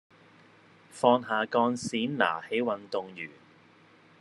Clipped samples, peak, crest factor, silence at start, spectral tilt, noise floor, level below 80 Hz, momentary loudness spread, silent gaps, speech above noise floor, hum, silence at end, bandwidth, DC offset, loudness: under 0.1%; -8 dBFS; 24 dB; 0.95 s; -4.5 dB/octave; -58 dBFS; -80 dBFS; 16 LU; none; 30 dB; none; 0.9 s; 11.5 kHz; under 0.1%; -28 LUFS